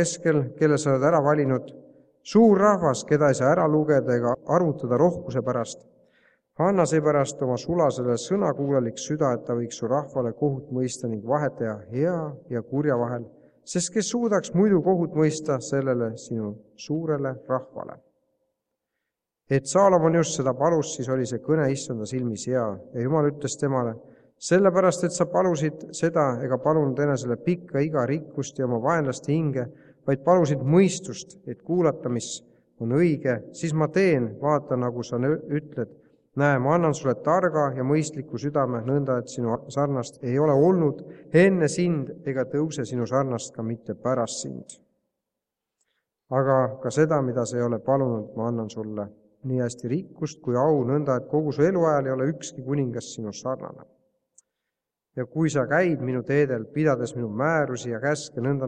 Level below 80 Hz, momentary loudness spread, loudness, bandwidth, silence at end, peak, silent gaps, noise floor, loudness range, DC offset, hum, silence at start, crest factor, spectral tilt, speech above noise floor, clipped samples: -64 dBFS; 12 LU; -24 LUFS; 10.5 kHz; 0 s; -6 dBFS; none; -86 dBFS; 6 LU; under 0.1%; none; 0 s; 18 dB; -6.5 dB/octave; 62 dB; under 0.1%